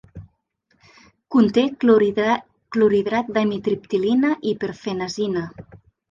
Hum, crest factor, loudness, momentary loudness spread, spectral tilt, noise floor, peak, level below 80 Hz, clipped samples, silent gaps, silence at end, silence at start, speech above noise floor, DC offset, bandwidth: none; 18 dB; -20 LUFS; 10 LU; -6.5 dB/octave; -67 dBFS; -4 dBFS; -56 dBFS; under 0.1%; none; 0.35 s; 0.15 s; 47 dB; under 0.1%; 7.4 kHz